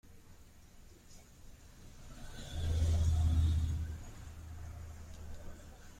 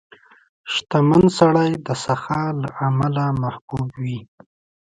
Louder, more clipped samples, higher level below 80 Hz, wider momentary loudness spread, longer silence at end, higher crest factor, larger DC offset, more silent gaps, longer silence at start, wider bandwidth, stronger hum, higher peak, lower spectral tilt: second, -35 LUFS vs -20 LUFS; neither; first, -44 dBFS vs -50 dBFS; first, 27 LU vs 13 LU; second, 0 s vs 0.7 s; about the same, 16 dB vs 18 dB; neither; second, none vs 3.61-3.68 s; second, 0.05 s vs 0.65 s; first, 11 kHz vs 9.4 kHz; neither; second, -22 dBFS vs -2 dBFS; about the same, -6 dB/octave vs -6.5 dB/octave